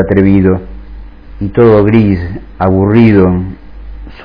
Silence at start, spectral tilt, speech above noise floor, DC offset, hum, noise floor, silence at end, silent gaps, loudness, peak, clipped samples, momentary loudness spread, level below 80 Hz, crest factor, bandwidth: 0 s; -11.5 dB/octave; 20 dB; 0.6%; none; -28 dBFS; 0 s; none; -9 LUFS; 0 dBFS; 1%; 17 LU; -28 dBFS; 10 dB; 5.2 kHz